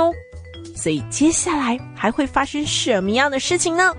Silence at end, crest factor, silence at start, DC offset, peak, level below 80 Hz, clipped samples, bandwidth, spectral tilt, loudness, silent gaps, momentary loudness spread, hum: 0 s; 16 dB; 0 s; under 0.1%; -4 dBFS; -46 dBFS; under 0.1%; 10.5 kHz; -3 dB/octave; -19 LUFS; none; 13 LU; none